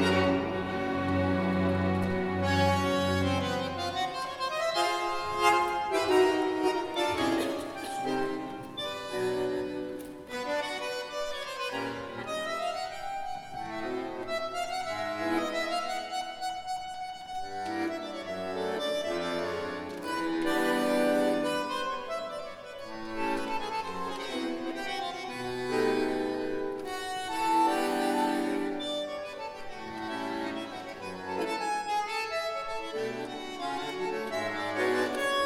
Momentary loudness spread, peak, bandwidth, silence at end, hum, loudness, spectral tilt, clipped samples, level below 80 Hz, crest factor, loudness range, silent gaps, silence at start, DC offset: 11 LU; -10 dBFS; 16 kHz; 0 s; none; -31 LUFS; -5 dB/octave; under 0.1%; -60 dBFS; 20 dB; 7 LU; none; 0 s; under 0.1%